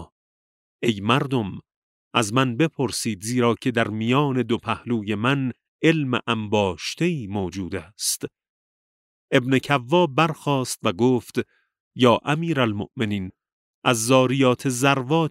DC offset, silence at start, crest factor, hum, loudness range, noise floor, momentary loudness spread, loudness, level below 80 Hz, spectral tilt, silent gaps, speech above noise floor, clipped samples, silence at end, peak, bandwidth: under 0.1%; 0 s; 20 dB; none; 3 LU; under -90 dBFS; 9 LU; -22 LUFS; -60 dBFS; -5 dB/octave; 0.12-0.79 s, 1.76-2.11 s, 5.68-5.79 s, 8.49-9.28 s, 11.80-11.91 s, 13.53-13.82 s; over 68 dB; under 0.1%; 0 s; -2 dBFS; 16 kHz